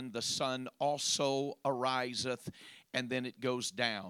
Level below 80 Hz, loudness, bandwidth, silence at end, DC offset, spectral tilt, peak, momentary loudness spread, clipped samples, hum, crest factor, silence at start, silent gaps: -76 dBFS; -35 LUFS; 17 kHz; 0 s; under 0.1%; -3 dB/octave; -16 dBFS; 7 LU; under 0.1%; none; 22 dB; 0 s; none